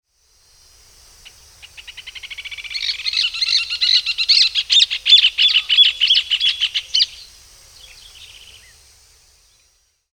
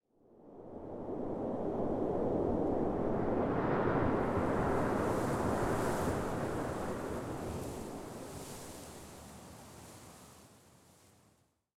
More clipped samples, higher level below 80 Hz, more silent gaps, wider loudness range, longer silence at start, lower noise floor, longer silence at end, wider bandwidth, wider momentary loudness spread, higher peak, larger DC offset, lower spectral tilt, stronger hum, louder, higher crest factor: neither; about the same, -56 dBFS vs -52 dBFS; neither; second, 13 LU vs 16 LU; first, 1.65 s vs 0.4 s; second, -61 dBFS vs -72 dBFS; first, 1.9 s vs 0.85 s; first, 19 kHz vs 17 kHz; about the same, 20 LU vs 19 LU; first, 0 dBFS vs -20 dBFS; neither; second, 4 dB/octave vs -6.5 dB/octave; neither; first, -13 LUFS vs -35 LUFS; about the same, 20 dB vs 16 dB